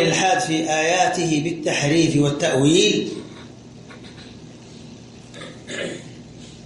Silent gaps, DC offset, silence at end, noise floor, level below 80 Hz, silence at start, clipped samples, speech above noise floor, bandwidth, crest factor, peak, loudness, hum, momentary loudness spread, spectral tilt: none; under 0.1%; 0.05 s; -41 dBFS; -56 dBFS; 0 s; under 0.1%; 22 dB; 11.5 kHz; 18 dB; -4 dBFS; -19 LUFS; none; 24 LU; -4 dB/octave